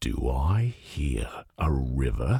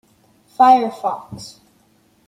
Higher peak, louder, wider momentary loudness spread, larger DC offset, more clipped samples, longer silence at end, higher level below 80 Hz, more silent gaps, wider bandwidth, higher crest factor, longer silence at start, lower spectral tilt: second, -12 dBFS vs -2 dBFS; second, -29 LUFS vs -15 LUFS; second, 7 LU vs 25 LU; neither; neither; second, 0 s vs 0.8 s; first, -30 dBFS vs -64 dBFS; neither; first, 13.5 kHz vs 12 kHz; about the same, 14 dB vs 18 dB; second, 0 s vs 0.6 s; first, -7 dB/octave vs -5 dB/octave